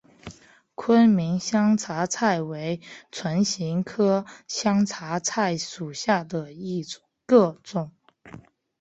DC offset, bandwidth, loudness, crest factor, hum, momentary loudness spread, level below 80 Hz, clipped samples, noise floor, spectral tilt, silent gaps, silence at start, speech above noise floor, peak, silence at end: under 0.1%; 8.2 kHz; -24 LUFS; 20 dB; none; 16 LU; -64 dBFS; under 0.1%; -49 dBFS; -5 dB/octave; none; 0.25 s; 25 dB; -6 dBFS; 0.4 s